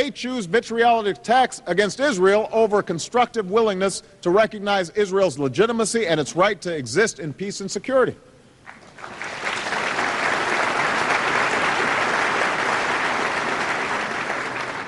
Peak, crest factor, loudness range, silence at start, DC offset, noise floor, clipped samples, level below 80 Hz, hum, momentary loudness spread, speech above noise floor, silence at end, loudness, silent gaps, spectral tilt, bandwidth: -4 dBFS; 16 dB; 4 LU; 0 s; under 0.1%; -46 dBFS; under 0.1%; -58 dBFS; none; 7 LU; 25 dB; 0 s; -21 LUFS; none; -3.5 dB/octave; 11.5 kHz